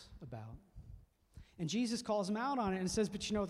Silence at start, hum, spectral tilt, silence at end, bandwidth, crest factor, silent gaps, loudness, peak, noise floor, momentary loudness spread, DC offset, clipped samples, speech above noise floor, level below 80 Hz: 0 s; none; -5 dB/octave; 0 s; 12.5 kHz; 14 dB; none; -37 LUFS; -24 dBFS; -60 dBFS; 21 LU; under 0.1%; under 0.1%; 23 dB; -60 dBFS